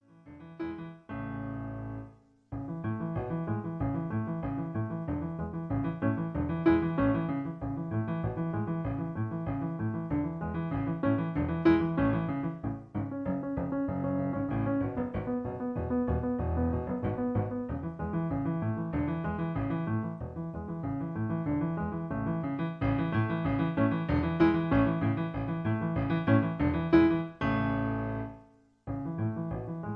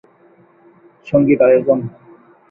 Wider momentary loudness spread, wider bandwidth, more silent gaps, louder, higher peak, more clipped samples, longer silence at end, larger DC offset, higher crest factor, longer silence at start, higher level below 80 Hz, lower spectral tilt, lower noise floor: first, 11 LU vs 8 LU; first, 5.6 kHz vs 3.4 kHz; neither; second, -32 LUFS vs -14 LUFS; second, -10 dBFS vs -2 dBFS; neither; second, 0 s vs 0.6 s; neither; about the same, 20 dB vs 16 dB; second, 0.25 s vs 1.05 s; first, -48 dBFS vs -56 dBFS; about the same, -10.5 dB/octave vs -10.5 dB/octave; first, -58 dBFS vs -50 dBFS